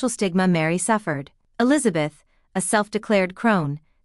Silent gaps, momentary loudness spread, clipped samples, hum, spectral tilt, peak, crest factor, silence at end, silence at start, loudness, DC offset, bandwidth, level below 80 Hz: none; 10 LU; under 0.1%; none; -5 dB/octave; -4 dBFS; 18 dB; 0.25 s; 0 s; -22 LUFS; under 0.1%; 13.5 kHz; -60 dBFS